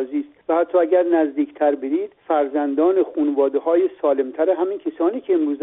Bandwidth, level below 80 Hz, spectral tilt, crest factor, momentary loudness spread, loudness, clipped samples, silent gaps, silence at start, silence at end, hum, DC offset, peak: 3.9 kHz; -68 dBFS; -4 dB/octave; 14 dB; 6 LU; -20 LUFS; under 0.1%; none; 0 s; 0 s; none; under 0.1%; -6 dBFS